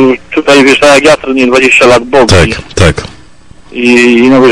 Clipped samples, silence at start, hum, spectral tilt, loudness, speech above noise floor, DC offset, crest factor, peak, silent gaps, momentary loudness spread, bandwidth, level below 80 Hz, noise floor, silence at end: 4%; 0 s; none; -4.5 dB/octave; -5 LUFS; 32 dB; under 0.1%; 6 dB; 0 dBFS; none; 8 LU; 13.5 kHz; -30 dBFS; -36 dBFS; 0 s